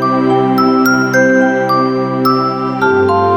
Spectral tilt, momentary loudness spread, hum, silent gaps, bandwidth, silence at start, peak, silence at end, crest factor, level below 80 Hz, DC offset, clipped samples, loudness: -6 dB/octave; 4 LU; none; none; 17 kHz; 0 s; 0 dBFS; 0 s; 10 dB; -52 dBFS; under 0.1%; under 0.1%; -12 LUFS